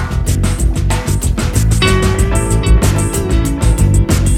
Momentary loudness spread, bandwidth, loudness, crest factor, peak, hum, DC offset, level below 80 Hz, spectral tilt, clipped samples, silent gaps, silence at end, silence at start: 4 LU; 16 kHz; -14 LUFS; 12 dB; 0 dBFS; none; under 0.1%; -14 dBFS; -5 dB/octave; under 0.1%; none; 0 s; 0 s